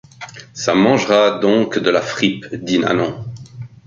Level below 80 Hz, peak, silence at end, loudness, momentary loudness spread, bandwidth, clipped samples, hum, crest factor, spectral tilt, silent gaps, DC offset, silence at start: -54 dBFS; -2 dBFS; 0.2 s; -16 LUFS; 20 LU; 7.6 kHz; under 0.1%; none; 16 dB; -5 dB/octave; none; under 0.1%; 0.2 s